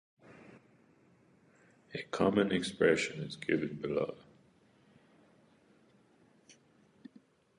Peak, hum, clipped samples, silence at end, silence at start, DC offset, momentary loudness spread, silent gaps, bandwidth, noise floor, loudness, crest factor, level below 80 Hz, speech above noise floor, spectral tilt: -14 dBFS; none; under 0.1%; 1.05 s; 0.3 s; under 0.1%; 28 LU; none; 11 kHz; -66 dBFS; -33 LUFS; 22 dB; -68 dBFS; 34 dB; -5.5 dB/octave